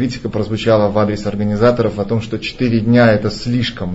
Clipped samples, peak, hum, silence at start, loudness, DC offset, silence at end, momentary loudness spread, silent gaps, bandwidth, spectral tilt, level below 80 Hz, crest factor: under 0.1%; 0 dBFS; none; 0 s; -15 LUFS; 0.3%; 0 s; 9 LU; none; 8 kHz; -7 dB/octave; -38 dBFS; 14 dB